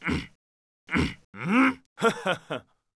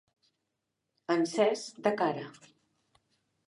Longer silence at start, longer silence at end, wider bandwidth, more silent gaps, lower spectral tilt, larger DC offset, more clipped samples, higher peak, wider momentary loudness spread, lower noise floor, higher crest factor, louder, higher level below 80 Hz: second, 0 s vs 1.1 s; second, 0.35 s vs 1.15 s; about the same, 11 kHz vs 11.5 kHz; first, 0.35-0.87 s, 1.24-1.33 s, 1.86-1.96 s vs none; about the same, -5.5 dB/octave vs -4.5 dB/octave; neither; neither; about the same, -10 dBFS vs -12 dBFS; about the same, 15 LU vs 16 LU; first, under -90 dBFS vs -84 dBFS; about the same, 18 dB vs 20 dB; first, -27 LUFS vs -30 LUFS; first, -48 dBFS vs -84 dBFS